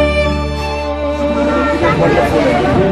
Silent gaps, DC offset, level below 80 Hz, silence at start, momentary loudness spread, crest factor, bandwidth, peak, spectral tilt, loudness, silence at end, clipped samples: none; under 0.1%; -24 dBFS; 0 s; 7 LU; 12 dB; 13 kHz; -2 dBFS; -6.5 dB/octave; -14 LUFS; 0 s; under 0.1%